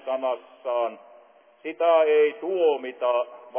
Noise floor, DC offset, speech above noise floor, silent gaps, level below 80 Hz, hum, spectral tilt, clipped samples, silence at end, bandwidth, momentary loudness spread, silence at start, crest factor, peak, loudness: -54 dBFS; under 0.1%; 30 dB; none; under -90 dBFS; none; -6.5 dB/octave; under 0.1%; 0 s; 3.5 kHz; 12 LU; 0.05 s; 14 dB; -10 dBFS; -24 LUFS